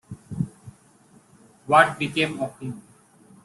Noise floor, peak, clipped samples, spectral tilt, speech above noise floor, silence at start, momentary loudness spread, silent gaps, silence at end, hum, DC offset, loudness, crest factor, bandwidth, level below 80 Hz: -55 dBFS; -2 dBFS; under 0.1%; -5 dB/octave; 34 dB; 0.1 s; 21 LU; none; 0.65 s; none; under 0.1%; -22 LUFS; 24 dB; 12.5 kHz; -60 dBFS